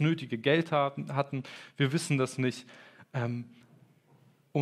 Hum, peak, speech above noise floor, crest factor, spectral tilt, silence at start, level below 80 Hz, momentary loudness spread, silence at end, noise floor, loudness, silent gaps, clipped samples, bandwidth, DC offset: none; -12 dBFS; 33 dB; 20 dB; -6 dB/octave; 0 s; -80 dBFS; 16 LU; 0 s; -63 dBFS; -31 LUFS; none; under 0.1%; 13.5 kHz; under 0.1%